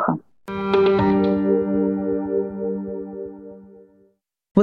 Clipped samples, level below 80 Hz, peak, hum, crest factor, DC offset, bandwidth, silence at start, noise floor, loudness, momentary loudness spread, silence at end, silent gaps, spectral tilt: under 0.1%; -52 dBFS; -2 dBFS; none; 18 dB; under 0.1%; 5.6 kHz; 0 s; -62 dBFS; -21 LUFS; 16 LU; 0 s; 4.51-4.55 s; -9.5 dB/octave